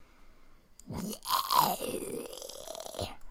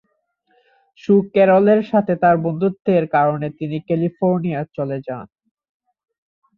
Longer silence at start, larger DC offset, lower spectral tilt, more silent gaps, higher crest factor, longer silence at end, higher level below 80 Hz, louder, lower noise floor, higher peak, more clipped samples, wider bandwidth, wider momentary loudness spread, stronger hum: second, 0 s vs 1.05 s; neither; second, -3 dB/octave vs -10 dB/octave; neither; first, 24 dB vs 16 dB; second, 0 s vs 1.35 s; about the same, -56 dBFS vs -60 dBFS; second, -33 LUFS vs -18 LUFS; second, -56 dBFS vs -67 dBFS; second, -10 dBFS vs -4 dBFS; neither; first, 17 kHz vs 5.6 kHz; first, 15 LU vs 12 LU; neither